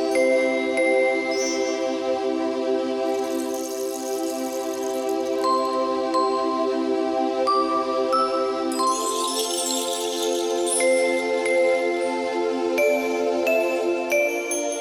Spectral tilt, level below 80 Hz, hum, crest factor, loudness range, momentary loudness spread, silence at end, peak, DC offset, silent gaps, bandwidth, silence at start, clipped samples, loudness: -1.5 dB/octave; -66 dBFS; none; 14 dB; 3 LU; 6 LU; 0 s; -10 dBFS; under 0.1%; none; 17 kHz; 0 s; under 0.1%; -23 LUFS